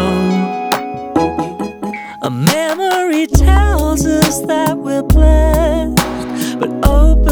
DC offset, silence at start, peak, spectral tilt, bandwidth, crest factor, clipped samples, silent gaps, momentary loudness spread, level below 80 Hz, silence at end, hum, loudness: under 0.1%; 0 s; 0 dBFS; -5.5 dB/octave; over 20 kHz; 12 dB; under 0.1%; none; 10 LU; -16 dBFS; 0 s; none; -14 LUFS